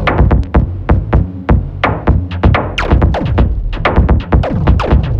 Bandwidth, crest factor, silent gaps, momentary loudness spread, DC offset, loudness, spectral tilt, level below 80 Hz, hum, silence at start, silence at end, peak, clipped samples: 6.6 kHz; 10 dB; none; 4 LU; under 0.1%; -13 LUFS; -8.5 dB/octave; -14 dBFS; none; 0 s; 0 s; 0 dBFS; under 0.1%